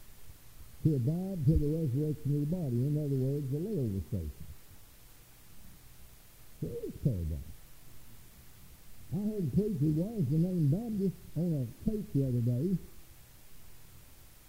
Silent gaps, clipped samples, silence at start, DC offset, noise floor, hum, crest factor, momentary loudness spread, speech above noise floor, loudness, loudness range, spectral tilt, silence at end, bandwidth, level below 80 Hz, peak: none; under 0.1%; 0 s; 0.2%; -56 dBFS; none; 18 dB; 10 LU; 25 dB; -33 LUFS; 9 LU; -9 dB/octave; 0.05 s; 16 kHz; -48 dBFS; -16 dBFS